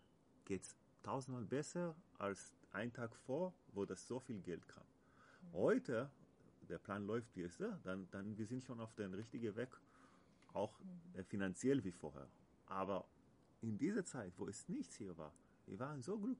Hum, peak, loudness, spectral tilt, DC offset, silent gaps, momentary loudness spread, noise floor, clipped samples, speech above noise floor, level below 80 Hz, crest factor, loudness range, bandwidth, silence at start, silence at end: none; -26 dBFS; -47 LUFS; -6 dB/octave; under 0.1%; none; 14 LU; -70 dBFS; under 0.1%; 24 dB; -80 dBFS; 20 dB; 4 LU; 10.5 kHz; 0.45 s; 0 s